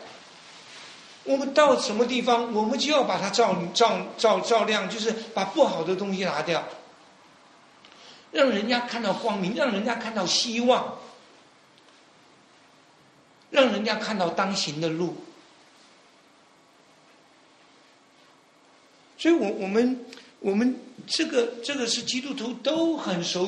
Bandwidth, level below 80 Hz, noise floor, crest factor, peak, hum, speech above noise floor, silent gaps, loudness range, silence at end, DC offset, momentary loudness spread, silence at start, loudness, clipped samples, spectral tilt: 11 kHz; -72 dBFS; -57 dBFS; 22 dB; -4 dBFS; none; 33 dB; none; 7 LU; 0 s; under 0.1%; 14 LU; 0 s; -25 LUFS; under 0.1%; -3.5 dB/octave